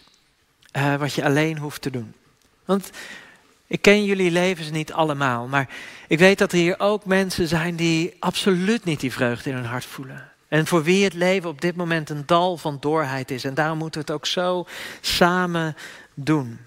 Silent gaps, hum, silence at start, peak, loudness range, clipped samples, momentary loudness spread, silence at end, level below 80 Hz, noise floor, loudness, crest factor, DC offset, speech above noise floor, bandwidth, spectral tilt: none; none; 0.75 s; -2 dBFS; 4 LU; under 0.1%; 14 LU; 0.05 s; -54 dBFS; -61 dBFS; -22 LUFS; 20 dB; under 0.1%; 40 dB; 16 kHz; -5 dB/octave